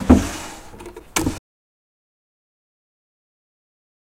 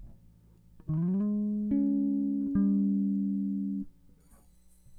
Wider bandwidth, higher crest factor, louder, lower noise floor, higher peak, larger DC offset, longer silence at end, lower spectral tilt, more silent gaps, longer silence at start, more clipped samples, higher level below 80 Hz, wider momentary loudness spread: first, 16.5 kHz vs 1.8 kHz; first, 24 dB vs 12 dB; first, -21 LUFS vs -30 LUFS; second, -39 dBFS vs -59 dBFS; first, 0 dBFS vs -18 dBFS; neither; first, 2.6 s vs 0 s; second, -5.5 dB/octave vs -12 dB/octave; neither; about the same, 0 s vs 0 s; neither; first, -34 dBFS vs -58 dBFS; first, 22 LU vs 9 LU